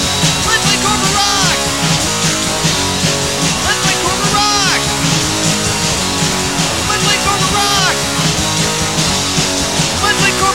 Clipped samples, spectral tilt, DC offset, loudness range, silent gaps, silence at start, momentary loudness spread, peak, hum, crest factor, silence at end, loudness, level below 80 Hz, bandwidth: under 0.1%; -2.5 dB/octave; 1%; 1 LU; none; 0 s; 3 LU; 0 dBFS; none; 14 dB; 0 s; -12 LUFS; -32 dBFS; 16.5 kHz